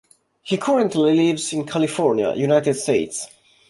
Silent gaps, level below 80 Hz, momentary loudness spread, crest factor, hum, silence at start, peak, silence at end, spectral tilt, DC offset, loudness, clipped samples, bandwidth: none; -62 dBFS; 11 LU; 16 dB; none; 0.45 s; -4 dBFS; 0.45 s; -5 dB/octave; under 0.1%; -20 LUFS; under 0.1%; 11.5 kHz